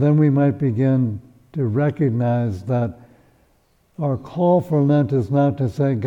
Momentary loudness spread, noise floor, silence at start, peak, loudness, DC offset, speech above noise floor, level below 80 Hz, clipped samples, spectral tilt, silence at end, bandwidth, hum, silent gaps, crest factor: 8 LU; -60 dBFS; 0 s; -6 dBFS; -20 LUFS; under 0.1%; 42 dB; -54 dBFS; under 0.1%; -10.5 dB/octave; 0 s; 6 kHz; none; none; 12 dB